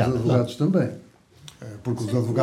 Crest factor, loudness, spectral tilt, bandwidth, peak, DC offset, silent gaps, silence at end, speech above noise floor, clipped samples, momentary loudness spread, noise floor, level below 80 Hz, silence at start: 16 dB; -24 LUFS; -8 dB/octave; 13 kHz; -8 dBFS; under 0.1%; none; 0 s; 26 dB; under 0.1%; 19 LU; -48 dBFS; -54 dBFS; 0 s